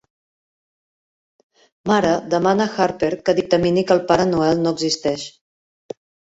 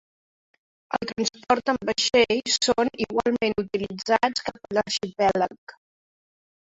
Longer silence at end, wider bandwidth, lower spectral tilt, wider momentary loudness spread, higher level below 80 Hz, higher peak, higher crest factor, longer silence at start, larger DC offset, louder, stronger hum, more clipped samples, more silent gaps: about the same, 1 s vs 1.05 s; about the same, 8 kHz vs 8.4 kHz; first, -5 dB/octave vs -3 dB/octave; first, 18 LU vs 9 LU; about the same, -52 dBFS vs -56 dBFS; first, -2 dBFS vs -6 dBFS; about the same, 18 dB vs 20 dB; first, 1.85 s vs 0.9 s; neither; first, -18 LUFS vs -24 LUFS; neither; neither; second, none vs 5.58-5.67 s